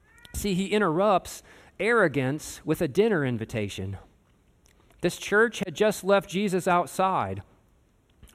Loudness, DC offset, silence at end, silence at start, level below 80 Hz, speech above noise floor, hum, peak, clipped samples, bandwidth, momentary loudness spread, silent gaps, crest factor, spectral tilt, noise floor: -26 LUFS; under 0.1%; 0.1 s; 0.35 s; -52 dBFS; 37 dB; none; -10 dBFS; under 0.1%; 15.5 kHz; 12 LU; none; 16 dB; -5 dB/octave; -63 dBFS